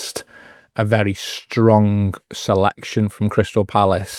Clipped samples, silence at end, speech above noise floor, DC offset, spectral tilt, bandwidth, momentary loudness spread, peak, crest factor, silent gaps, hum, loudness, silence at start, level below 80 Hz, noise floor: under 0.1%; 0 s; 28 dB; under 0.1%; -6 dB/octave; 14.5 kHz; 12 LU; 0 dBFS; 18 dB; none; none; -18 LUFS; 0 s; -54 dBFS; -46 dBFS